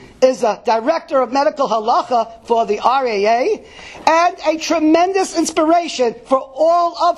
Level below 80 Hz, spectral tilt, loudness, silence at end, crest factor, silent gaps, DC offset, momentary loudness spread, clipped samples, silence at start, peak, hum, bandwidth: -54 dBFS; -3 dB/octave; -16 LUFS; 0 s; 16 dB; none; under 0.1%; 5 LU; under 0.1%; 0 s; 0 dBFS; none; 13 kHz